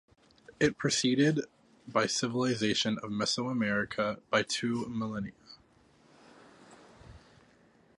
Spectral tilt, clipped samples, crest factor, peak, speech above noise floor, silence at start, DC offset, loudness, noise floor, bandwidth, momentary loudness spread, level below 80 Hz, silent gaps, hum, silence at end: -4 dB/octave; under 0.1%; 22 dB; -12 dBFS; 33 dB; 0.6 s; under 0.1%; -30 LUFS; -63 dBFS; 11.5 kHz; 8 LU; -64 dBFS; none; none; 0.8 s